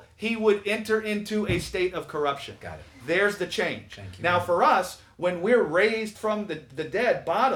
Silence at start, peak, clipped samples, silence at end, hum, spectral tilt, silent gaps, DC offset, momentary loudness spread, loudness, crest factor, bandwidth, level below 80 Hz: 0 s; -8 dBFS; under 0.1%; 0 s; none; -5 dB/octave; none; under 0.1%; 13 LU; -25 LUFS; 18 dB; 18 kHz; -54 dBFS